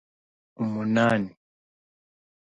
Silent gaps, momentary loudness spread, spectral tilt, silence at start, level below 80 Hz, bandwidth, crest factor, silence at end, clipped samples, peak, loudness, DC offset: none; 11 LU; -7 dB/octave; 0.6 s; -66 dBFS; 9.2 kHz; 18 dB; 1.15 s; under 0.1%; -10 dBFS; -25 LUFS; under 0.1%